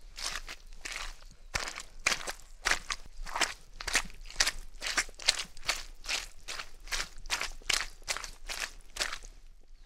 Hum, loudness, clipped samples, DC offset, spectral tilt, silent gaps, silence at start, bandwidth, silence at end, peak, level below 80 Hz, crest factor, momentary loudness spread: none; -34 LUFS; under 0.1%; under 0.1%; 0.5 dB/octave; none; 0 s; 16 kHz; 0 s; -4 dBFS; -46 dBFS; 32 dB; 11 LU